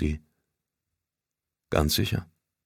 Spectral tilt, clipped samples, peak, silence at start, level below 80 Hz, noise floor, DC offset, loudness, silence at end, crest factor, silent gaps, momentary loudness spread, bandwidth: -5 dB/octave; under 0.1%; -8 dBFS; 0 s; -40 dBFS; -88 dBFS; under 0.1%; -27 LUFS; 0.4 s; 24 dB; none; 10 LU; 17 kHz